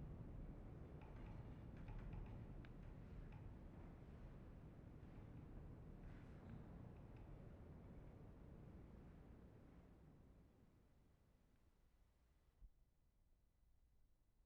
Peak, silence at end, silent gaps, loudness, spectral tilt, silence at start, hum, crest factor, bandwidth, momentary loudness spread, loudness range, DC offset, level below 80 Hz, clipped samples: -44 dBFS; 0 s; none; -61 LUFS; -8.5 dB/octave; 0 s; none; 16 dB; 6.2 kHz; 7 LU; 7 LU; under 0.1%; -64 dBFS; under 0.1%